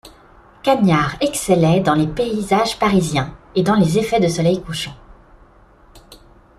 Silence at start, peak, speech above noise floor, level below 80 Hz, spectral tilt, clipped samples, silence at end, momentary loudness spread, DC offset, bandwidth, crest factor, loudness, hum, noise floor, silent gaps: 0.05 s; -2 dBFS; 32 dB; -44 dBFS; -5.5 dB/octave; under 0.1%; 0.45 s; 8 LU; under 0.1%; 14 kHz; 16 dB; -17 LUFS; none; -48 dBFS; none